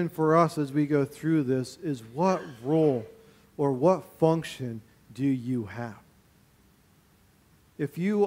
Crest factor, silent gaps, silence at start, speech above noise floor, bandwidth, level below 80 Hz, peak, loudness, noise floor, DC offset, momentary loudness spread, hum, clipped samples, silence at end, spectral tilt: 20 dB; none; 0 s; 35 dB; 16 kHz; -66 dBFS; -8 dBFS; -27 LUFS; -61 dBFS; under 0.1%; 14 LU; none; under 0.1%; 0 s; -7.5 dB/octave